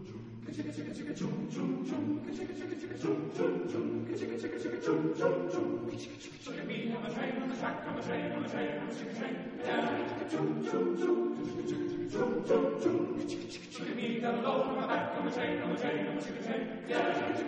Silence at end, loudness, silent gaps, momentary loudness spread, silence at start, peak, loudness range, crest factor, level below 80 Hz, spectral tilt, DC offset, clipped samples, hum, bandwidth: 0 s; -35 LUFS; none; 9 LU; 0 s; -16 dBFS; 4 LU; 18 dB; -70 dBFS; -6 dB/octave; under 0.1%; under 0.1%; none; 9 kHz